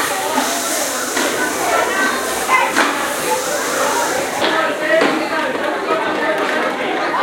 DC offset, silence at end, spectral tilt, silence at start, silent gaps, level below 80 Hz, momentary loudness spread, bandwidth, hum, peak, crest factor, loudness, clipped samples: under 0.1%; 0 s; -1.5 dB/octave; 0 s; none; -56 dBFS; 4 LU; 16.5 kHz; none; 0 dBFS; 16 dB; -17 LUFS; under 0.1%